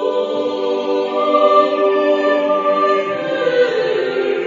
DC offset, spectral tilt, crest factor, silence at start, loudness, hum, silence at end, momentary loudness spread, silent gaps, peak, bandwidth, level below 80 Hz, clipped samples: under 0.1%; -5 dB/octave; 16 dB; 0 s; -16 LUFS; none; 0 s; 7 LU; none; 0 dBFS; 7.6 kHz; -70 dBFS; under 0.1%